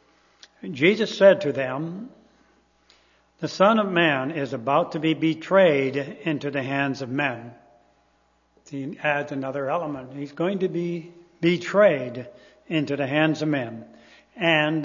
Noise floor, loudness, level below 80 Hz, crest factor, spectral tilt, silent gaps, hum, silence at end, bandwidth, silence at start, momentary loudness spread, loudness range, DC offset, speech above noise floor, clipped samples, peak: -64 dBFS; -23 LUFS; -70 dBFS; 22 dB; -6.5 dB/octave; none; none; 0 s; 7.4 kHz; 0.65 s; 16 LU; 7 LU; under 0.1%; 41 dB; under 0.1%; -2 dBFS